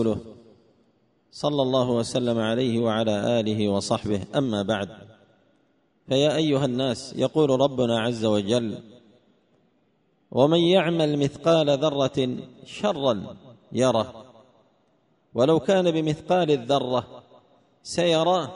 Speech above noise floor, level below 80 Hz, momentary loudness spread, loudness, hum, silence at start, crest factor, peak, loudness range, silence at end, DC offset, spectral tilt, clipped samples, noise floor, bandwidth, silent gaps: 44 dB; -60 dBFS; 10 LU; -23 LUFS; none; 0 s; 18 dB; -6 dBFS; 3 LU; 0 s; under 0.1%; -6 dB/octave; under 0.1%; -66 dBFS; 10.5 kHz; none